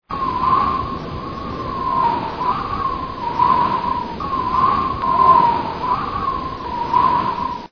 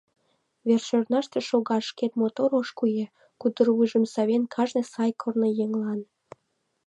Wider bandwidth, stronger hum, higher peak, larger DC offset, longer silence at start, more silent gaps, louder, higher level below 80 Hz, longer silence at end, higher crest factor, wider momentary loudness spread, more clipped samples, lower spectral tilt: second, 5.4 kHz vs 8.8 kHz; neither; first, -2 dBFS vs -8 dBFS; first, 0.3% vs under 0.1%; second, 0.1 s vs 0.65 s; neither; first, -19 LUFS vs -26 LUFS; first, -38 dBFS vs -80 dBFS; second, 0.05 s vs 0.8 s; about the same, 18 dB vs 18 dB; first, 11 LU vs 7 LU; neither; about the same, -7 dB/octave vs -6 dB/octave